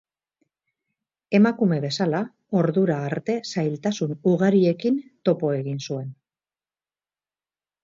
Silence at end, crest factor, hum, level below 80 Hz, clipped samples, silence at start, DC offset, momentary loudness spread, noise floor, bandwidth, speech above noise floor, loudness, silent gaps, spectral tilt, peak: 1.7 s; 18 dB; none; -70 dBFS; under 0.1%; 1.3 s; under 0.1%; 9 LU; under -90 dBFS; 7.6 kHz; over 68 dB; -23 LUFS; none; -7 dB/octave; -6 dBFS